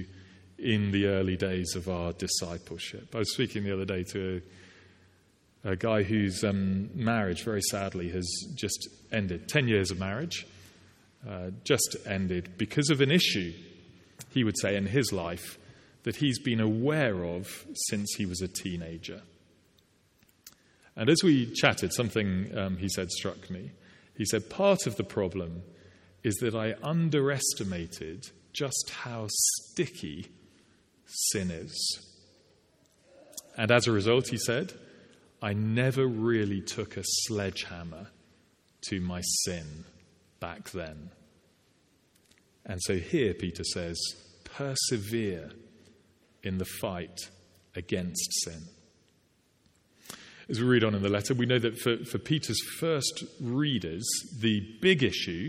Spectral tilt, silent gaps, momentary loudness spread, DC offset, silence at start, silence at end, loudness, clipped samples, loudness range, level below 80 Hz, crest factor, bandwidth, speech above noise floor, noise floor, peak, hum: -4 dB/octave; none; 16 LU; under 0.1%; 0 s; 0 s; -30 LUFS; under 0.1%; 7 LU; -60 dBFS; 26 dB; 16.5 kHz; 38 dB; -68 dBFS; -6 dBFS; none